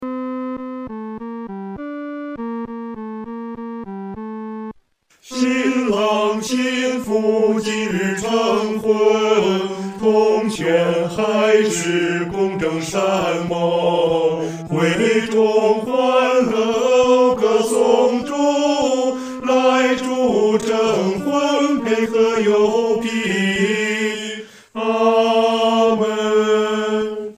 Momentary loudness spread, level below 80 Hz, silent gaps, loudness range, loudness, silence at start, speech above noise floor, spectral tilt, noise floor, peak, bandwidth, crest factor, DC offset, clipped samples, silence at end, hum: 14 LU; -56 dBFS; none; 12 LU; -17 LUFS; 0 s; 39 dB; -4.5 dB/octave; -56 dBFS; -2 dBFS; 15.5 kHz; 16 dB; under 0.1%; under 0.1%; 0.05 s; none